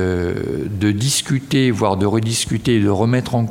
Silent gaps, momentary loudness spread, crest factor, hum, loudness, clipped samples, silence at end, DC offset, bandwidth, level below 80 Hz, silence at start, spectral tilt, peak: none; 5 LU; 14 dB; none; -18 LUFS; under 0.1%; 0 s; under 0.1%; 16.5 kHz; -46 dBFS; 0 s; -5 dB/octave; -2 dBFS